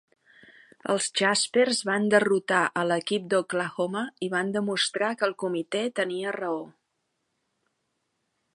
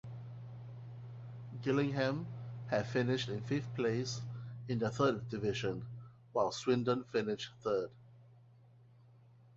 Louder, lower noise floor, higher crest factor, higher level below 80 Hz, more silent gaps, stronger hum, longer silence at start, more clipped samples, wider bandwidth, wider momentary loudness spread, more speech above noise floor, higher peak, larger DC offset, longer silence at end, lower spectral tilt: first, -26 LUFS vs -36 LUFS; first, -78 dBFS vs -62 dBFS; about the same, 20 dB vs 20 dB; second, -78 dBFS vs -68 dBFS; neither; neither; first, 0.85 s vs 0.05 s; neither; first, 11.5 kHz vs 7.6 kHz; second, 8 LU vs 16 LU; first, 52 dB vs 27 dB; first, -6 dBFS vs -18 dBFS; neither; first, 1.85 s vs 1.15 s; second, -3.5 dB/octave vs -5.5 dB/octave